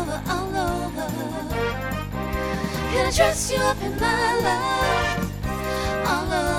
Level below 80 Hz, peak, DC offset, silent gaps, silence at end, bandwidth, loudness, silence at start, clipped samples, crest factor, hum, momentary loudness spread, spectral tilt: -34 dBFS; -6 dBFS; under 0.1%; none; 0 s; over 20 kHz; -24 LUFS; 0 s; under 0.1%; 18 dB; none; 8 LU; -4 dB/octave